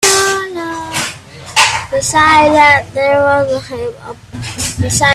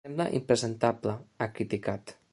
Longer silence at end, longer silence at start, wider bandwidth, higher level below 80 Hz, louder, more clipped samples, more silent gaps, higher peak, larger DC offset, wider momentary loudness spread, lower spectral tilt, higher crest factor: second, 0 s vs 0.2 s; about the same, 0 s vs 0.05 s; first, 16 kHz vs 11.5 kHz; first, -40 dBFS vs -62 dBFS; first, -11 LUFS vs -31 LUFS; neither; neither; first, 0 dBFS vs -8 dBFS; neither; first, 17 LU vs 9 LU; second, -2.5 dB/octave vs -5.5 dB/octave; second, 12 dB vs 22 dB